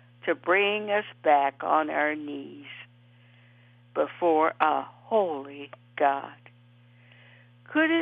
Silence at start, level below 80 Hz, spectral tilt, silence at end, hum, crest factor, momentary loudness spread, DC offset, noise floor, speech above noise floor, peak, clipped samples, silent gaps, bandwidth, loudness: 0.25 s; -86 dBFS; -7.5 dB/octave; 0 s; 60 Hz at -55 dBFS; 22 dB; 19 LU; under 0.1%; -56 dBFS; 30 dB; -6 dBFS; under 0.1%; none; 4.6 kHz; -26 LUFS